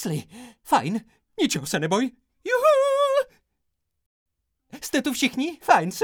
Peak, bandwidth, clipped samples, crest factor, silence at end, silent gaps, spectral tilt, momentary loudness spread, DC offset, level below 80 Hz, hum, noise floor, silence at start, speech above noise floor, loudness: -2 dBFS; 20 kHz; under 0.1%; 22 dB; 0 s; 4.06-4.26 s; -4 dB/octave; 15 LU; under 0.1%; -64 dBFS; none; -76 dBFS; 0 s; 52 dB; -23 LUFS